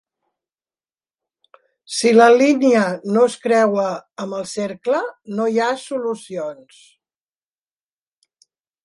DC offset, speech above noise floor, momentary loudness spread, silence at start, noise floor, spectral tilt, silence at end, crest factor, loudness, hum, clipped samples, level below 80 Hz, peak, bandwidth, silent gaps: under 0.1%; over 73 dB; 15 LU; 1.9 s; under -90 dBFS; -4.5 dB/octave; 2.3 s; 18 dB; -18 LUFS; none; under 0.1%; -72 dBFS; -2 dBFS; 11.5 kHz; none